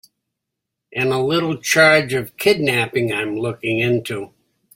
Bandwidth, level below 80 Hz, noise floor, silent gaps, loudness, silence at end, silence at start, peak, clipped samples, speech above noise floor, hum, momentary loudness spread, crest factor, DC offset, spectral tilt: 16.5 kHz; -58 dBFS; -81 dBFS; none; -17 LUFS; 0.5 s; 0.9 s; 0 dBFS; under 0.1%; 63 dB; none; 13 LU; 18 dB; under 0.1%; -4.5 dB/octave